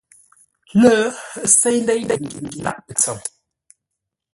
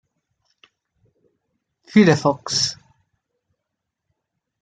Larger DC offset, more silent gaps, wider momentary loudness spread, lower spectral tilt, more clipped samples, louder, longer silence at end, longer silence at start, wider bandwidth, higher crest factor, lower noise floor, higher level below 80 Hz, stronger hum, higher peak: neither; neither; first, 14 LU vs 8 LU; about the same, -3.5 dB/octave vs -4.5 dB/octave; neither; about the same, -17 LUFS vs -18 LUFS; second, 1.05 s vs 1.9 s; second, 0.75 s vs 1.95 s; first, 12 kHz vs 9.2 kHz; about the same, 20 dB vs 22 dB; about the same, -81 dBFS vs -81 dBFS; first, -56 dBFS vs -64 dBFS; neither; about the same, 0 dBFS vs -2 dBFS